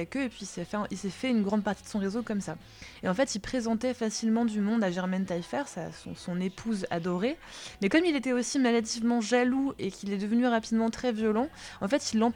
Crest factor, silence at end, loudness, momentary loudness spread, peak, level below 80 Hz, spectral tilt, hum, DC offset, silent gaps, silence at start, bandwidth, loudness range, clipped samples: 20 dB; 0 s; -30 LUFS; 10 LU; -10 dBFS; -58 dBFS; -5 dB/octave; none; under 0.1%; none; 0 s; 12 kHz; 4 LU; under 0.1%